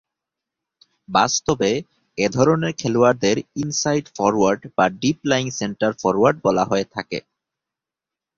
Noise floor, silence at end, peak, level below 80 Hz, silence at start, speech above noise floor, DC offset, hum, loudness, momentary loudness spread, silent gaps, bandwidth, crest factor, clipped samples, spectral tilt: -88 dBFS; 1.15 s; -2 dBFS; -54 dBFS; 1.1 s; 68 dB; under 0.1%; none; -20 LUFS; 8 LU; none; 7.6 kHz; 20 dB; under 0.1%; -4.5 dB/octave